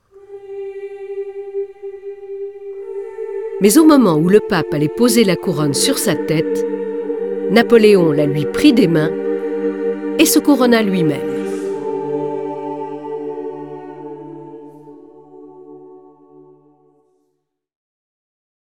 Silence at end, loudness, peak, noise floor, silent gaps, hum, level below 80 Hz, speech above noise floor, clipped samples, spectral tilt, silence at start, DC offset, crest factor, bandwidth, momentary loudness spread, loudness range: 2.8 s; -15 LUFS; 0 dBFS; -70 dBFS; none; none; -54 dBFS; 57 dB; under 0.1%; -5 dB/octave; 0.15 s; 0.3%; 18 dB; 19 kHz; 20 LU; 15 LU